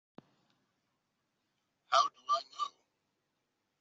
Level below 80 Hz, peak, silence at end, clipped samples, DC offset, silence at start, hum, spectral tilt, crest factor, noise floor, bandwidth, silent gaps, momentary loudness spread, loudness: under -90 dBFS; -12 dBFS; 1.1 s; under 0.1%; under 0.1%; 1.9 s; none; 0 dB/octave; 26 dB; -83 dBFS; 8 kHz; none; 11 LU; -33 LUFS